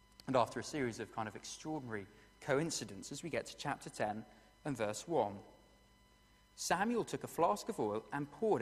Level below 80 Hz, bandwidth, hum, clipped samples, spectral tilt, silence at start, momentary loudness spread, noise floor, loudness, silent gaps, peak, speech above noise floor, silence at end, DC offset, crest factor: -70 dBFS; 15.5 kHz; 50 Hz at -70 dBFS; under 0.1%; -4.5 dB/octave; 0.25 s; 11 LU; -67 dBFS; -39 LUFS; none; -18 dBFS; 29 dB; 0 s; under 0.1%; 22 dB